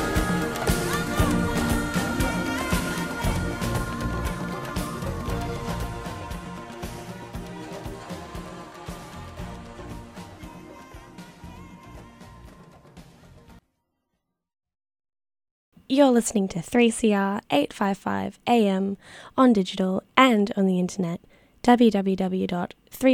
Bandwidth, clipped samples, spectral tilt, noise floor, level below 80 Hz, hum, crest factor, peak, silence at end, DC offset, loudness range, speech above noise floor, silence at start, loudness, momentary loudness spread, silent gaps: 16.5 kHz; under 0.1%; -5.5 dB/octave; -79 dBFS; -40 dBFS; none; 26 dB; 0 dBFS; 0 s; under 0.1%; 19 LU; 57 dB; 0 s; -24 LUFS; 22 LU; 15.51-15.72 s